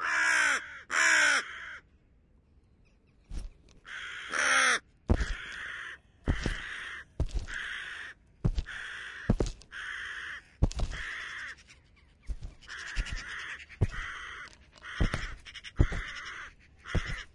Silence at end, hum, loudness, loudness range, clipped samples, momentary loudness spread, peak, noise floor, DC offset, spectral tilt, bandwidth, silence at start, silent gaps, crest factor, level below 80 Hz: 0.05 s; none; -32 LUFS; 8 LU; under 0.1%; 21 LU; -10 dBFS; -63 dBFS; under 0.1%; -3 dB/octave; 11.5 kHz; 0 s; none; 24 dB; -40 dBFS